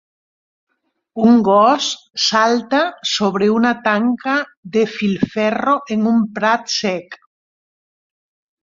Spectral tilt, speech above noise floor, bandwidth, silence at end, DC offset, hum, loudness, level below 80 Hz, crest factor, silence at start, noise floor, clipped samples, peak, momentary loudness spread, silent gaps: -4.5 dB/octave; over 74 dB; 7.6 kHz; 1.5 s; under 0.1%; none; -16 LUFS; -60 dBFS; 16 dB; 1.15 s; under -90 dBFS; under 0.1%; -2 dBFS; 7 LU; 4.57-4.63 s